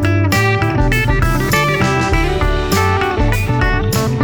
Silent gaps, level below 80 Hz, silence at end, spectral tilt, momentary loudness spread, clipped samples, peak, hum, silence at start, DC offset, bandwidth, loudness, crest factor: none; -20 dBFS; 0 s; -5.5 dB/octave; 3 LU; under 0.1%; 0 dBFS; none; 0 s; under 0.1%; over 20 kHz; -15 LUFS; 14 dB